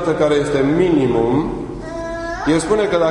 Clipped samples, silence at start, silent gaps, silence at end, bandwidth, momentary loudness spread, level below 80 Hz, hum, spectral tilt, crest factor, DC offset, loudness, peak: under 0.1%; 0 s; none; 0 s; 11 kHz; 11 LU; -36 dBFS; none; -6 dB/octave; 14 dB; under 0.1%; -17 LUFS; -2 dBFS